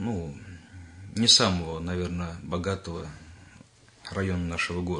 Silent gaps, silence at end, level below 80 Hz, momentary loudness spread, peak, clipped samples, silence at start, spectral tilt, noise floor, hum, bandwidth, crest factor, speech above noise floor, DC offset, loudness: none; 0 s; -54 dBFS; 26 LU; -6 dBFS; under 0.1%; 0 s; -3.5 dB/octave; -54 dBFS; none; 10.5 kHz; 22 dB; 27 dB; under 0.1%; -26 LUFS